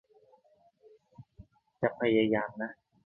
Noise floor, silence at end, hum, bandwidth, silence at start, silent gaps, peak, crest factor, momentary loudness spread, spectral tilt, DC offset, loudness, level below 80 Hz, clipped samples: -66 dBFS; 0.35 s; none; 4 kHz; 1.2 s; none; -12 dBFS; 22 dB; 13 LU; -9 dB/octave; under 0.1%; -30 LUFS; -66 dBFS; under 0.1%